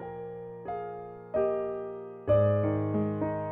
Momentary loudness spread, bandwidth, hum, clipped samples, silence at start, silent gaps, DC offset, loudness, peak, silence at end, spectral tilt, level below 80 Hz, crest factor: 15 LU; 3.8 kHz; none; under 0.1%; 0 s; none; under 0.1%; -30 LUFS; -14 dBFS; 0 s; -12 dB/octave; -56 dBFS; 16 dB